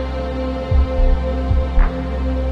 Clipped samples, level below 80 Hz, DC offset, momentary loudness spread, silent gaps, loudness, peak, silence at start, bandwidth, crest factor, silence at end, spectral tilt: under 0.1%; -18 dBFS; under 0.1%; 5 LU; none; -20 LUFS; -2 dBFS; 0 s; 5.8 kHz; 14 dB; 0 s; -8.5 dB/octave